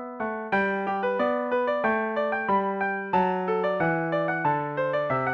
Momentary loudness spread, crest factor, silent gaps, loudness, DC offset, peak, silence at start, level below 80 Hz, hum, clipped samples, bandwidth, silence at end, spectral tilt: 2 LU; 14 dB; none; -26 LUFS; under 0.1%; -12 dBFS; 0 s; -62 dBFS; none; under 0.1%; 6.4 kHz; 0 s; -8 dB/octave